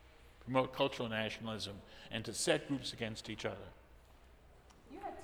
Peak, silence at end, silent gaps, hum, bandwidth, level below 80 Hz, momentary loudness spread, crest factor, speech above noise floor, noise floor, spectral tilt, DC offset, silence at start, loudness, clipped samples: -16 dBFS; 0 s; none; none; over 20 kHz; -64 dBFS; 17 LU; 24 dB; 22 dB; -61 dBFS; -4 dB/octave; under 0.1%; 0 s; -39 LUFS; under 0.1%